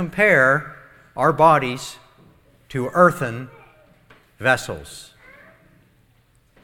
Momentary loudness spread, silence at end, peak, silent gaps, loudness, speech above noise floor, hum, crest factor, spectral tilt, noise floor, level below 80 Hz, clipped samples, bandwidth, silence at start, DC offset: 23 LU; 1.6 s; 0 dBFS; none; -18 LUFS; 40 dB; none; 22 dB; -5.5 dB/octave; -58 dBFS; -54 dBFS; under 0.1%; 18 kHz; 0 s; under 0.1%